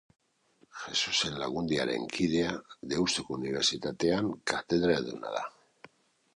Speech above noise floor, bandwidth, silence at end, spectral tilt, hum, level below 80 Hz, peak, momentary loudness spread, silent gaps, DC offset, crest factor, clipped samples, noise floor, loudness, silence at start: 37 dB; 11.5 kHz; 0.85 s; -3.5 dB/octave; none; -60 dBFS; -10 dBFS; 9 LU; none; under 0.1%; 22 dB; under 0.1%; -67 dBFS; -30 LUFS; 0.75 s